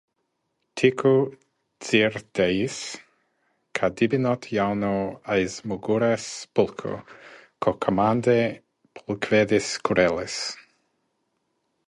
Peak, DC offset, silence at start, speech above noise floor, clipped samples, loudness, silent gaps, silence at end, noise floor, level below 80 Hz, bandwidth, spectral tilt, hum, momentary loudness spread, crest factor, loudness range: -6 dBFS; under 0.1%; 0.75 s; 53 dB; under 0.1%; -24 LUFS; none; 1.25 s; -76 dBFS; -58 dBFS; 11.5 kHz; -5 dB/octave; none; 13 LU; 20 dB; 3 LU